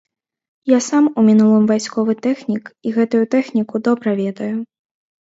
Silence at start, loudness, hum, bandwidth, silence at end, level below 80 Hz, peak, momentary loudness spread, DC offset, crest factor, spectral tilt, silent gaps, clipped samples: 0.65 s; -17 LUFS; none; 8 kHz; 0.6 s; -68 dBFS; -2 dBFS; 12 LU; under 0.1%; 16 dB; -6 dB/octave; none; under 0.1%